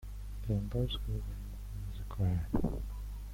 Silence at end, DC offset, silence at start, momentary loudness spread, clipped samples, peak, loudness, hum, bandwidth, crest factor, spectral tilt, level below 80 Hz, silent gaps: 0 s; under 0.1%; 0 s; 11 LU; under 0.1%; -18 dBFS; -38 LUFS; 50 Hz at -40 dBFS; 16.5 kHz; 16 dB; -7.5 dB/octave; -40 dBFS; none